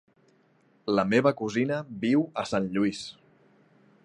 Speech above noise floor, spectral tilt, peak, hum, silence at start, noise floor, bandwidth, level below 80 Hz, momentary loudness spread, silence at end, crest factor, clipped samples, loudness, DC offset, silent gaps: 38 dB; -6 dB/octave; -8 dBFS; none; 0.85 s; -64 dBFS; 10.5 kHz; -64 dBFS; 11 LU; 0.95 s; 20 dB; under 0.1%; -27 LUFS; under 0.1%; none